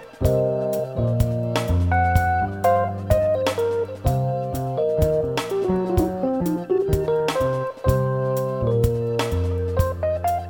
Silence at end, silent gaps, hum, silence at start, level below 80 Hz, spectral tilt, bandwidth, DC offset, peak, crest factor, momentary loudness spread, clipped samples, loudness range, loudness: 0 s; none; none; 0 s; -34 dBFS; -7 dB/octave; 19 kHz; under 0.1%; -6 dBFS; 16 dB; 4 LU; under 0.1%; 1 LU; -22 LUFS